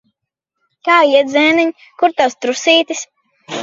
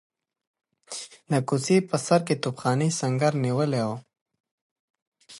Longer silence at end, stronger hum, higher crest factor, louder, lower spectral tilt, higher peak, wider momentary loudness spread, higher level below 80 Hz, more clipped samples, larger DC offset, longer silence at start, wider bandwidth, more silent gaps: about the same, 0 s vs 0 s; neither; about the same, 16 dB vs 20 dB; first, -13 LUFS vs -25 LUFS; second, -2 dB/octave vs -5.5 dB/octave; first, 0 dBFS vs -6 dBFS; about the same, 13 LU vs 14 LU; about the same, -68 dBFS vs -70 dBFS; neither; neither; about the same, 0.85 s vs 0.9 s; second, 7.8 kHz vs 11.5 kHz; second, none vs 4.21-4.26 s, 4.40-4.44 s, 4.51-4.94 s, 5.02-5.12 s